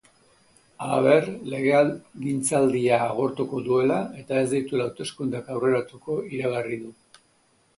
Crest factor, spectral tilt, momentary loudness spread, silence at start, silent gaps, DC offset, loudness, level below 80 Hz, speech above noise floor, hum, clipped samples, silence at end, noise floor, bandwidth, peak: 20 dB; -5.5 dB/octave; 10 LU; 0.8 s; none; under 0.1%; -24 LUFS; -66 dBFS; 40 dB; none; under 0.1%; 0.85 s; -64 dBFS; 11.5 kHz; -6 dBFS